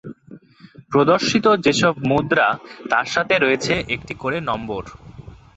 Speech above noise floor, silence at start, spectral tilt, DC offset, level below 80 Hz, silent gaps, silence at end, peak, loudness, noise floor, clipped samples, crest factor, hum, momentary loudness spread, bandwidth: 27 dB; 0.05 s; -4.5 dB/octave; under 0.1%; -48 dBFS; none; 0.25 s; -2 dBFS; -19 LUFS; -46 dBFS; under 0.1%; 18 dB; none; 12 LU; 8.2 kHz